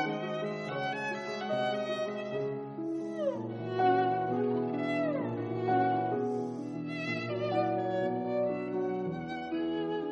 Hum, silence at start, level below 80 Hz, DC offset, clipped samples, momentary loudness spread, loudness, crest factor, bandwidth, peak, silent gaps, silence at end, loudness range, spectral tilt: none; 0 s; -74 dBFS; under 0.1%; under 0.1%; 8 LU; -33 LUFS; 16 dB; 10 kHz; -16 dBFS; none; 0 s; 4 LU; -7 dB/octave